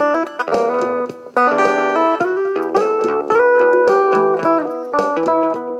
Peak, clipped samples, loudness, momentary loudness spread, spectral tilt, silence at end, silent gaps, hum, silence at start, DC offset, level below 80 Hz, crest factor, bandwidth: -2 dBFS; under 0.1%; -16 LUFS; 7 LU; -5.5 dB/octave; 0 s; none; none; 0 s; under 0.1%; -62 dBFS; 12 dB; 9.8 kHz